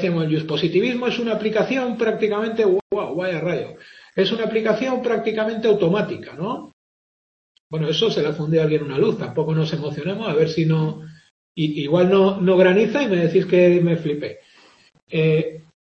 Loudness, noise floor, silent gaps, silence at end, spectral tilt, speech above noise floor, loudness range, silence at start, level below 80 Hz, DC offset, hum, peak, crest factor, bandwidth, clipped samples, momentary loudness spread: -20 LUFS; -53 dBFS; 2.82-2.90 s, 6.73-7.70 s, 11.31-11.55 s, 15.03-15.07 s; 0.25 s; -7 dB/octave; 33 dB; 5 LU; 0 s; -62 dBFS; under 0.1%; none; -2 dBFS; 18 dB; 6.6 kHz; under 0.1%; 12 LU